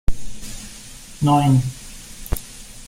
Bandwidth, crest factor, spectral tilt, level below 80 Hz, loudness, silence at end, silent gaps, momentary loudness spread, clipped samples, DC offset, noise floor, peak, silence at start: 16.5 kHz; 16 dB; -6.5 dB/octave; -32 dBFS; -20 LUFS; 0 s; none; 21 LU; under 0.1%; under 0.1%; -39 dBFS; -4 dBFS; 0.1 s